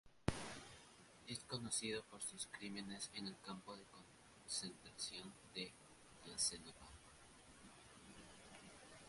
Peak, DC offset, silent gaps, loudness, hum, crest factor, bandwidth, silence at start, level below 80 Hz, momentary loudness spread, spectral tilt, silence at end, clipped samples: -20 dBFS; under 0.1%; none; -48 LUFS; none; 32 dB; 11.5 kHz; 0.05 s; -68 dBFS; 20 LU; -2.5 dB/octave; 0 s; under 0.1%